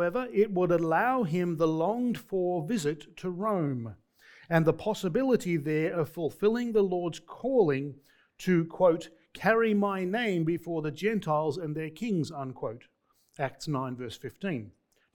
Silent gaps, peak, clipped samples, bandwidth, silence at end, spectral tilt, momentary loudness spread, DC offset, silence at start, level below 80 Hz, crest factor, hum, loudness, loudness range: none; -8 dBFS; under 0.1%; 19 kHz; 0.45 s; -7 dB/octave; 11 LU; under 0.1%; 0 s; -62 dBFS; 20 dB; none; -29 LUFS; 5 LU